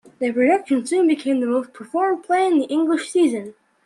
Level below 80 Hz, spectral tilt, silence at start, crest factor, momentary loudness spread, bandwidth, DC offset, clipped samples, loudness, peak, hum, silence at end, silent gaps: -72 dBFS; -4 dB/octave; 0.2 s; 14 dB; 7 LU; 11.5 kHz; under 0.1%; under 0.1%; -20 LUFS; -6 dBFS; none; 0.35 s; none